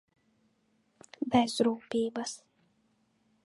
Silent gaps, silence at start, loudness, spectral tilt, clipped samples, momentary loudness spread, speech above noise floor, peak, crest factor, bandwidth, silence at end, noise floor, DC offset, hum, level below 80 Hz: none; 1.2 s; -31 LUFS; -4.5 dB/octave; under 0.1%; 13 LU; 43 dB; -12 dBFS; 22 dB; 11.5 kHz; 1.1 s; -72 dBFS; under 0.1%; none; -68 dBFS